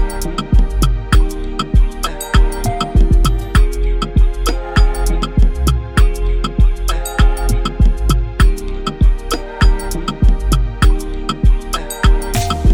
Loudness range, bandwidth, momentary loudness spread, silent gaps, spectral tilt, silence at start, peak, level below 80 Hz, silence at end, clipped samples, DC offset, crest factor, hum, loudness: 1 LU; 16.5 kHz; 6 LU; none; -5.5 dB/octave; 0 s; 0 dBFS; -14 dBFS; 0 s; under 0.1%; under 0.1%; 12 dB; none; -17 LUFS